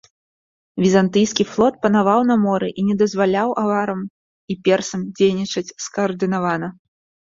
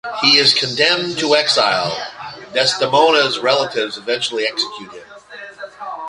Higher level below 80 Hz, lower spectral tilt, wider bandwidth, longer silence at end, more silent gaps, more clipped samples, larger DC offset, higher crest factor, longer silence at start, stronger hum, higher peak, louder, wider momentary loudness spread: about the same, -58 dBFS vs -60 dBFS; first, -5.5 dB/octave vs -2.5 dB/octave; second, 7.6 kHz vs 11.5 kHz; first, 0.5 s vs 0 s; first, 4.10-4.48 s vs none; neither; neither; about the same, 16 dB vs 18 dB; first, 0.75 s vs 0.05 s; neither; about the same, -2 dBFS vs 0 dBFS; second, -19 LUFS vs -15 LUFS; second, 11 LU vs 21 LU